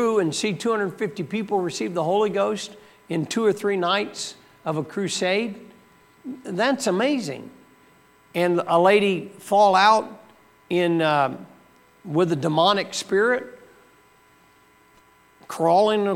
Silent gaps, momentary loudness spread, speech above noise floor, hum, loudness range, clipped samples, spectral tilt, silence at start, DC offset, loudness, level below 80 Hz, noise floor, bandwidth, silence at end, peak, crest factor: none; 15 LU; 34 dB; none; 6 LU; under 0.1%; -4.5 dB/octave; 0 s; under 0.1%; -22 LUFS; -72 dBFS; -56 dBFS; 16.5 kHz; 0 s; -4 dBFS; 18 dB